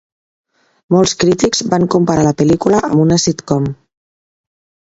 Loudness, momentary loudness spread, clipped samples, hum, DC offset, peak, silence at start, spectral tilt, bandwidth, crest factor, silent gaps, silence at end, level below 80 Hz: -13 LUFS; 6 LU; under 0.1%; none; under 0.1%; 0 dBFS; 0.9 s; -5.5 dB/octave; 8 kHz; 14 dB; none; 1.1 s; -42 dBFS